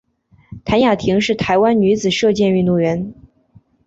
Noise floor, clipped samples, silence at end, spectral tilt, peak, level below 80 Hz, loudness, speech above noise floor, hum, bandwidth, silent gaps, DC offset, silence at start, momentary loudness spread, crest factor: -51 dBFS; under 0.1%; 0.75 s; -6 dB/octave; -2 dBFS; -44 dBFS; -15 LUFS; 37 dB; none; 8 kHz; none; under 0.1%; 0.5 s; 7 LU; 14 dB